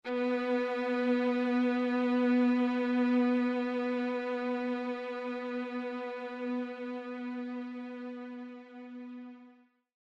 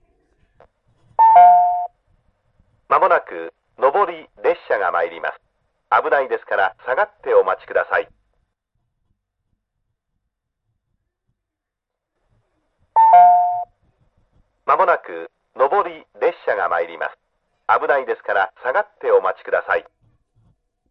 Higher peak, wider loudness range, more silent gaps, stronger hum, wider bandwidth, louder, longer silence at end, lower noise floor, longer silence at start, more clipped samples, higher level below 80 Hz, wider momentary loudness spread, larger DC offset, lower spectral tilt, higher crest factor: second, -18 dBFS vs 0 dBFS; first, 11 LU vs 6 LU; neither; neither; first, 6 kHz vs 5.2 kHz; second, -32 LUFS vs -17 LUFS; second, 0.55 s vs 1.1 s; second, -61 dBFS vs -82 dBFS; second, 0.05 s vs 1.2 s; neither; second, -82 dBFS vs -64 dBFS; about the same, 17 LU vs 17 LU; neither; about the same, -6 dB/octave vs -6 dB/octave; about the same, 14 dB vs 18 dB